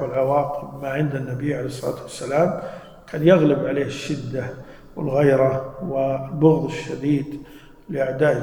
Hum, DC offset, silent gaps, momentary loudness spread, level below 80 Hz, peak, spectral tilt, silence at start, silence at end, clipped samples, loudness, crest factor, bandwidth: none; under 0.1%; none; 15 LU; -50 dBFS; -2 dBFS; -7.5 dB/octave; 0 s; 0 s; under 0.1%; -22 LUFS; 20 dB; 18 kHz